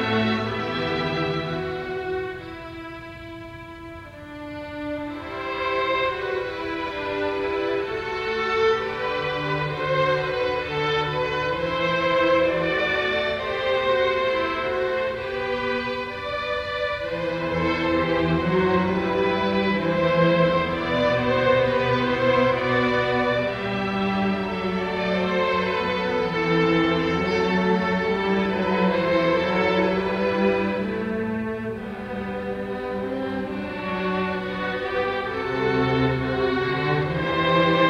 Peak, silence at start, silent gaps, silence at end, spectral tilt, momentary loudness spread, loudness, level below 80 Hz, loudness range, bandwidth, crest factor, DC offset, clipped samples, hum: -6 dBFS; 0 s; none; 0 s; -6.5 dB/octave; 9 LU; -23 LUFS; -48 dBFS; 7 LU; 9.6 kHz; 16 dB; under 0.1%; under 0.1%; none